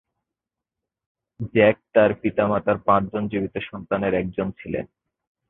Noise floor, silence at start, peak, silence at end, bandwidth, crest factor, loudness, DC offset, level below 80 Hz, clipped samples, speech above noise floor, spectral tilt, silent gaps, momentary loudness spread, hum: -87 dBFS; 1.4 s; -4 dBFS; 0.65 s; 4 kHz; 20 dB; -22 LUFS; under 0.1%; -52 dBFS; under 0.1%; 65 dB; -11 dB/octave; none; 12 LU; none